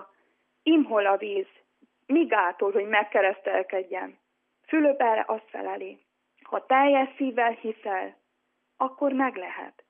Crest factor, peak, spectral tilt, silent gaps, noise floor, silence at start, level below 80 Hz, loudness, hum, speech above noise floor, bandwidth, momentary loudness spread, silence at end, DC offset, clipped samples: 18 dB; -8 dBFS; -8 dB/octave; none; -76 dBFS; 0 s; under -90 dBFS; -25 LUFS; none; 51 dB; 3.6 kHz; 13 LU; 0.2 s; under 0.1%; under 0.1%